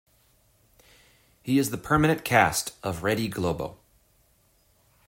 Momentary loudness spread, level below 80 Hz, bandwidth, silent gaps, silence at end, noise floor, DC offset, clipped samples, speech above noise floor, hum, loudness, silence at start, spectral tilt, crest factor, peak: 12 LU; -52 dBFS; 16.5 kHz; none; 1.35 s; -64 dBFS; under 0.1%; under 0.1%; 40 dB; none; -25 LUFS; 1.45 s; -4.5 dB/octave; 22 dB; -6 dBFS